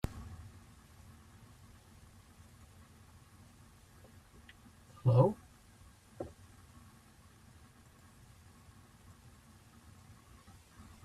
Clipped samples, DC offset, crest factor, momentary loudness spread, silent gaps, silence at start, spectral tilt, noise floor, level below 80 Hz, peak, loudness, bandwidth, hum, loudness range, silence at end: under 0.1%; under 0.1%; 28 dB; 22 LU; none; 0.05 s; -8.5 dB/octave; -61 dBFS; -60 dBFS; -14 dBFS; -34 LUFS; 13.5 kHz; none; 23 LU; 4.75 s